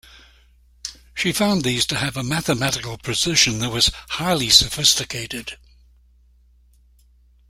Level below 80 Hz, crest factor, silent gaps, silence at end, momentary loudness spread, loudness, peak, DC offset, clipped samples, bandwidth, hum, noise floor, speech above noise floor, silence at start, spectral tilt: -44 dBFS; 22 dB; none; 1.95 s; 18 LU; -18 LUFS; 0 dBFS; under 0.1%; under 0.1%; 16 kHz; none; -54 dBFS; 34 dB; 0.15 s; -2.5 dB/octave